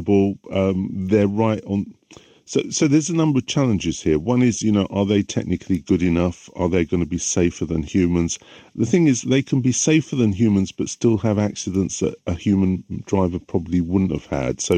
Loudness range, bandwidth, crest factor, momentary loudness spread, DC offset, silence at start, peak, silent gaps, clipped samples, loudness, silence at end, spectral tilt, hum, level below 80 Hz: 2 LU; 9.6 kHz; 16 dB; 7 LU; under 0.1%; 0 s; -4 dBFS; none; under 0.1%; -20 LUFS; 0 s; -5.5 dB/octave; none; -46 dBFS